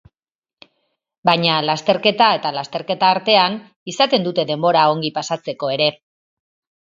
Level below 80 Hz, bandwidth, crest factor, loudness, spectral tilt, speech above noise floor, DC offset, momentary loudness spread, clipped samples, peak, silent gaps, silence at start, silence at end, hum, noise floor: -66 dBFS; 7.8 kHz; 18 dB; -17 LUFS; -4.5 dB/octave; over 73 dB; under 0.1%; 10 LU; under 0.1%; 0 dBFS; 3.76-3.86 s; 1.25 s; 0.9 s; none; under -90 dBFS